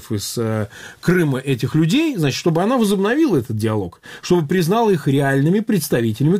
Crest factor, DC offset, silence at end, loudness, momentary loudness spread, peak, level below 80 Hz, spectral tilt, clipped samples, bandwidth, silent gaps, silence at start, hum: 16 dB; under 0.1%; 0 s; -18 LUFS; 8 LU; -2 dBFS; -52 dBFS; -6 dB/octave; under 0.1%; 16 kHz; none; 0 s; none